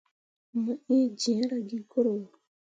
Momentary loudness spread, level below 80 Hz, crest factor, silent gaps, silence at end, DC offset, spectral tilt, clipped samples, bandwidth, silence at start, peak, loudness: 11 LU; -82 dBFS; 16 dB; none; 0.5 s; under 0.1%; -5 dB/octave; under 0.1%; 9.2 kHz; 0.55 s; -14 dBFS; -29 LUFS